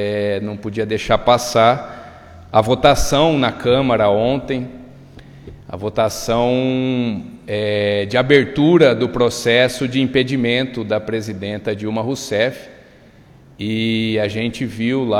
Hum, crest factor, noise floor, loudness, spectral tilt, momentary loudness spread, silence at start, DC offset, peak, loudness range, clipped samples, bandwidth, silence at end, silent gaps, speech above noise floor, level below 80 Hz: none; 18 dB; -45 dBFS; -17 LUFS; -5.5 dB/octave; 11 LU; 0 s; under 0.1%; 0 dBFS; 6 LU; under 0.1%; 16.5 kHz; 0 s; none; 29 dB; -40 dBFS